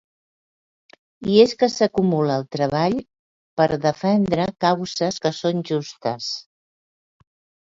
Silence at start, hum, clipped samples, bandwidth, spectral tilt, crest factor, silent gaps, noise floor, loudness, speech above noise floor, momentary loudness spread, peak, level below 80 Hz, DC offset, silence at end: 1.2 s; none; under 0.1%; 7.8 kHz; -6 dB/octave; 20 dB; 3.19-3.57 s; under -90 dBFS; -21 LUFS; over 70 dB; 11 LU; -2 dBFS; -56 dBFS; under 0.1%; 1.25 s